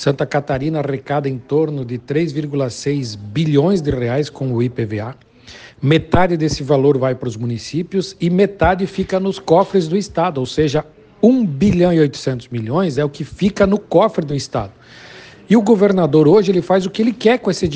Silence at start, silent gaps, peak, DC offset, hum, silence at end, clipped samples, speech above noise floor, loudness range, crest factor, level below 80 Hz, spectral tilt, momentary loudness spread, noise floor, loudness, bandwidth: 0 s; none; 0 dBFS; under 0.1%; none; 0 s; under 0.1%; 24 dB; 4 LU; 16 dB; -40 dBFS; -7 dB/octave; 10 LU; -40 dBFS; -17 LUFS; 9.6 kHz